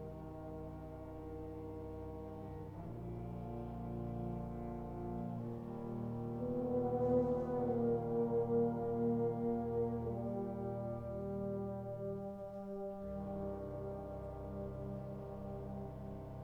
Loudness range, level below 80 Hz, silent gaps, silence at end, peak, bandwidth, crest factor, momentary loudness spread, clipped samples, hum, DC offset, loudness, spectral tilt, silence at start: 10 LU; -56 dBFS; none; 0 s; -22 dBFS; 15.5 kHz; 18 dB; 12 LU; under 0.1%; none; under 0.1%; -41 LUFS; -11 dB/octave; 0 s